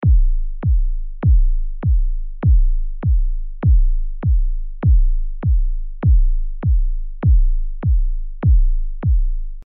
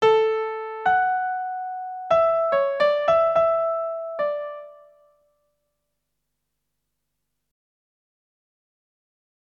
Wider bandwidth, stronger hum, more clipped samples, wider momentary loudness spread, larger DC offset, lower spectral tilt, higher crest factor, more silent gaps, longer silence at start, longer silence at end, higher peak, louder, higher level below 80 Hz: second, 2.3 kHz vs 7.6 kHz; second, none vs 50 Hz at -75 dBFS; neither; second, 7 LU vs 12 LU; neither; first, -11.5 dB/octave vs -4 dB/octave; second, 8 dB vs 18 dB; neither; about the same, 0 s vs 0 s; second, 0.05 s vs 4.8 s; about the same, -6 dBFS vs -8 dBFS; about the same, -20 LUFS vs -22 LUFS; first, -16 dBFS vs -64 dBFS